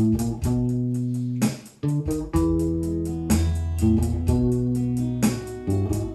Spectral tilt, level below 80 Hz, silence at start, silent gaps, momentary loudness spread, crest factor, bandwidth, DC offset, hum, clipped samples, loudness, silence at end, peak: -7 dB/octave; -34 dBFS; 0 s; none; 5 LU; 16 dB; 15 kHz; under 0.1%; none; under 0.1%; -24 LUFS; 0 s; -8 dBFS